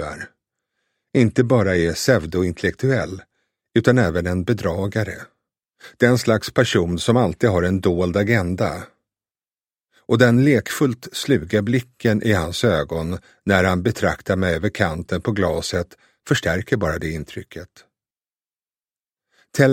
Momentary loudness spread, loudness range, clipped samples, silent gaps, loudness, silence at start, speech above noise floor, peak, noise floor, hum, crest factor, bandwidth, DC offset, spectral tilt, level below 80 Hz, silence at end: 12 LU; 5 LU; under 0.1%; none; -20 LUFS; 0 s; over 71 dB; 0 dBFS; under -90 dBFS; none; 20 dB; 16.5 kHz; under 0.1%; -6 dB/octave; -44 dBFS; 0 s